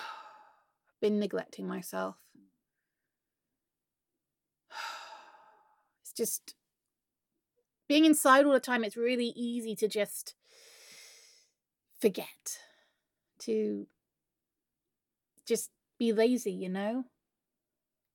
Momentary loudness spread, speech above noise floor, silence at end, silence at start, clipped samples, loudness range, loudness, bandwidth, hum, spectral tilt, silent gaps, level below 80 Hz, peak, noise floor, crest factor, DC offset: 24 LU; 60 dB; 1.1 s; 0 s; under 0.1%; 17 LU; -31 LUFS; 17.5 kHz; none; -3.5 dB/octave; none; under -90 dBFS; -10 dBFS; -90 dBFS; 24 dB; under 0.1%